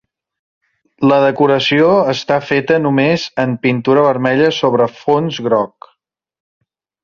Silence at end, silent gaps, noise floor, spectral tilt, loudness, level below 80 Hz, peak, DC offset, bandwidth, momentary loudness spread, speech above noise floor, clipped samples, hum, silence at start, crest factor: 1.4 s; none; -66 dBFS; -6.5 dB/octave; -14 LUFS; -56 dBFS; -2 dBFS; under 0.1%; 7.2 kHz; 5 LU; 53 dB; under 0.1%; none; 1 s; 14 dB